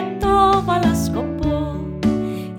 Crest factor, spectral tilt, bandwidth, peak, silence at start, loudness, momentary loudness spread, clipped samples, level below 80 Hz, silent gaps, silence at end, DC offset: 16 dB; -6.5 dB/octave; 18.5 kHz; -4 dBFS; 0 s; -19 LUFS; 9 LU; under 0.1%; -32 dBFS; none; 0 s; under 0.1%